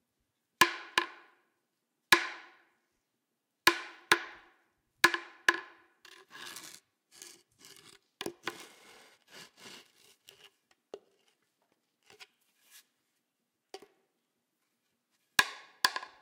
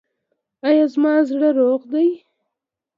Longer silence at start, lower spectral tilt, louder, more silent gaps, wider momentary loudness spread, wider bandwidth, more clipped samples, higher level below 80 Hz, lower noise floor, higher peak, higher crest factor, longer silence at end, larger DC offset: about the same, 0.6 s vs 0.65 s; second, -0.5 dB/octave vs -6 dB/octave; second, -30 LUFS vs -18 LUFS; neither; first, 26 LU vs 5 LU; first, 16 kHz vs 5.8 kHz; neither; about the same, -78 dBFS vs -78 dBFS; about the same, -84 dBFS vs -83 dBFS; about the same, -8 dBFS vs -6 dBFS; first, 28 dB vs 14 dB; second, 0.15 s vs 0.8 s; neither